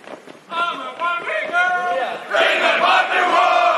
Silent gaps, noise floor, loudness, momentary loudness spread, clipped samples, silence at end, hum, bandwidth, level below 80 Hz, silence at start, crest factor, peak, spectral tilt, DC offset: none; -38 dBFS; -17 LUFS; 9 LU; under 0.1%; 0 s; none; 12 kHz; -82 dBFS; 0.05 s; 16 dB; -2 dBFS; -1.5 dB/octave; under 0.1%